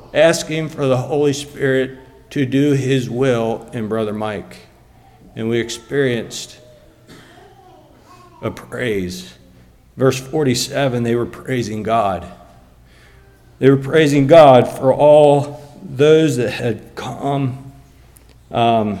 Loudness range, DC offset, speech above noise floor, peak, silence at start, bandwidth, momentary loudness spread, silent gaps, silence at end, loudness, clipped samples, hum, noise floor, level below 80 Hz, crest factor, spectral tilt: 12 LU; under 0.1%; 32 dB; 0 dBFS; 0.15 s; 16 kHz; 17 LU; none; 0 s; -16 LUFS; under 0.1%; none; -47 dBFS; -48 dBFS; 16 dB; -6 dB/octave